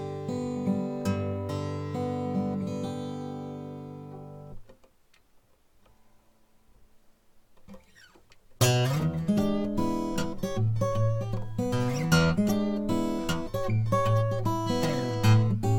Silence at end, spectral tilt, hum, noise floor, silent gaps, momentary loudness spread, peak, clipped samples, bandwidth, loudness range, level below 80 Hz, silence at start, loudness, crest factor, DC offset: 0 s; -6.5 dB/octave; none; -61 dBFS; none; 14 LU; -8 dBFS; under 0.1%; 17.5 kHz; 14 LU; -48 dBFS; 0 s; -28 LUFS; 20 dB; under 0.1%